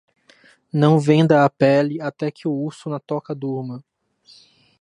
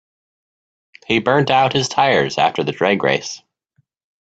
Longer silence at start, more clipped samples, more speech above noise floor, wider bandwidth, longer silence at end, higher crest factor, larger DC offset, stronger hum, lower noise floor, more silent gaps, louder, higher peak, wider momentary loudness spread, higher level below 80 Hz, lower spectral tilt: second, 0.75 s vs 1.1 s; neither; second, 35 dB vs 48 dB; first, 10.5 kHz vs 8.6 kHz; first, 1 s vs 0.85 s; about the same, 18 dB vs 18 dB; neither; neither; second, -54 dBFS vs -64 dBFS; neither; second, -19 LUFS vs -16 LUFS; about the same, -2 dBFS vs 0 dBFS; first, 14 LU vs 6 LU; second, -66 dBFS vs -56 dBFS; first, -8 dB/octave vs -4.5 dB/octave